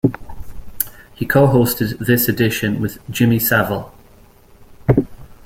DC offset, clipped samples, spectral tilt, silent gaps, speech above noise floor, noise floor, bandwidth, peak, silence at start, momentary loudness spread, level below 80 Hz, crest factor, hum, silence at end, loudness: under 0.1%; under 0.1%; -6 dB/octave; none; 30 dB; -46 dBFS; 16.5 kHz; 0 dBFS; 0.05 s; 14 LU; -40 dBFS; 18 dB; none; 0.15 s; -17 LUFS